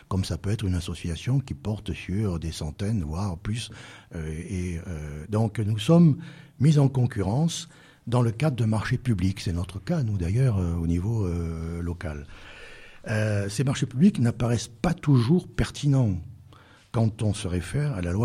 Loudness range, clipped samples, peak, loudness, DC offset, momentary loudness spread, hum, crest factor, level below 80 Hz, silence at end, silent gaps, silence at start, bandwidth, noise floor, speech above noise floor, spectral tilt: 6 LU; under 0.1%; -8 dBFS; -26 LUFS; under 0.1%; 14 LU; none; 18 dB; -42 dBFS; 0 s; none; 0.1 s; 13.5 kHz; -52 dBFS; 27 dB; -7 dB/octave